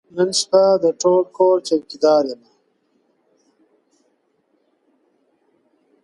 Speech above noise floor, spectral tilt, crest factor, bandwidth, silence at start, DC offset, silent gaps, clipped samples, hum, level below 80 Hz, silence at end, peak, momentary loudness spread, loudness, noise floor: 49 dB; -4 dB/octave; 18 dB; 11.5 kHz; 0.15 s; under 0.1%; none; under 0.1%; none; -70 dBFS; 3.7 s; -2 dBFS; 7 LU; -17 LUFS; -65 dBFS